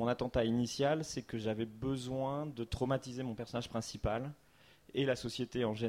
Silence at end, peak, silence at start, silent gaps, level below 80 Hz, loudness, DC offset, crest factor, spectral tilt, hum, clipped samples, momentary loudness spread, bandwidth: 0 s; -20 dBFS; 0 s; none; -54 dBFS; -37 LUFS; under 0.1%; 16 dB; -5.5 dB/octave; none; under 0.1%; 8 LU; 15.5 kHz